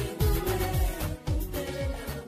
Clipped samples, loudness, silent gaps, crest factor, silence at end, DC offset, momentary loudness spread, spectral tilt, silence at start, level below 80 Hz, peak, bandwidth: under 0.1%; -30 LUFS; none; 14 dB; 0 s; under 0.1%; 6 LU; -5.5 dB/octave; 0 s; -32 dBFS; -16 dBFS; 15.5 kHz